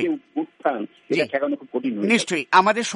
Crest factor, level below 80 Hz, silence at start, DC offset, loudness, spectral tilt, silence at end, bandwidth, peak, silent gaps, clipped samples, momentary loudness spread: 18 dB; -70 dBFS; 0 s; under 0.1%; -22 LUFS; -4 dB/octave; 0 s; 11.5 kHz; -4 dBFS; none; under 0.1%; 10 LU